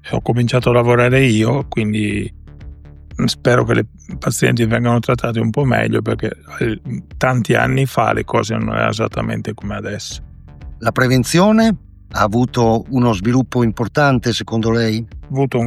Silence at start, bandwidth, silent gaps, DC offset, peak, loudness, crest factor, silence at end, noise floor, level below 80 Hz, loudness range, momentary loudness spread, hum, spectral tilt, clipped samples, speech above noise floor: 0.05 s; 14.5 kHz; none; under 0.1%; 0 dBFS; -16 LUFS; 16 dB; 0 s; -35 dBFS; -38 dBFS; 3 LU; 12 LU; none; -6 dB/octave; under 0.1%; 20 dB